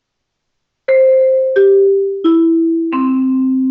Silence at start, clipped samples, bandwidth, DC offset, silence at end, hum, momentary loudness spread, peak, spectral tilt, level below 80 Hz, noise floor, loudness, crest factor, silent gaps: 0.9 s; under 0.1%; 4.3 kHz; under 0.1%; 0 s; none; 5 LU; -2 dBFS; -8.5 dB/octave; -66 dBFS; -72 dBFS; -12 LUFS; 10 dB; none